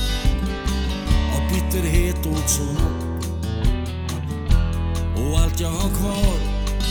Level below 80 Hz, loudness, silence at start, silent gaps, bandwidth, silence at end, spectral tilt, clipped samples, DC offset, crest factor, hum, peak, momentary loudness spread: -22 dBFS; -23 LUFS; 0 s; none; over 20 kHz; 0 s; -5 dB/octave; under 0.1%; under 0.1%; 18 dB; none; -4 dBFS; 6 LU